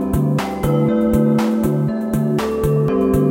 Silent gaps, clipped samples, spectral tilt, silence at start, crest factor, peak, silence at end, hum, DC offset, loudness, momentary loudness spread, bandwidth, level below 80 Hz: none; under 0.1%; -8 dB/octave; 0 s; 12 dB; -4 dBFS; 0 s; none; under 0.1%; -17 LUFS; 4 LU; 17 kHz; -34 dBFS